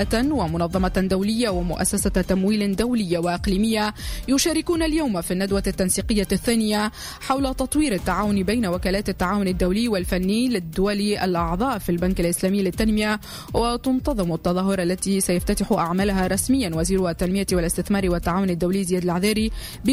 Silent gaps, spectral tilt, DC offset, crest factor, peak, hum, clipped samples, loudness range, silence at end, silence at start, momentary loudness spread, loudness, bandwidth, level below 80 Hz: none; -5 dB/octave; under 0.1%; 14 dB; -6 dBFS; none; under 0.1%; 1 LU; 0 s; 0 s; 3 LU; -22 LUFS; 16 kHz; -34 dBFS